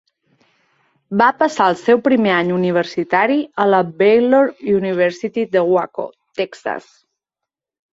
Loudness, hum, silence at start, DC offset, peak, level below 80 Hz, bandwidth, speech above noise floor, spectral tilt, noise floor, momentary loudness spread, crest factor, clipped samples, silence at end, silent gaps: -16 LUFS; none; 1.1 s; under 0.1%; -2 dBFS; -62 dBFS; 8 kHz; 68 dB; -6.5 dB/octave; -84 dBFS; 12 LU; 16 dB; under 0.1%; 1.15 s; none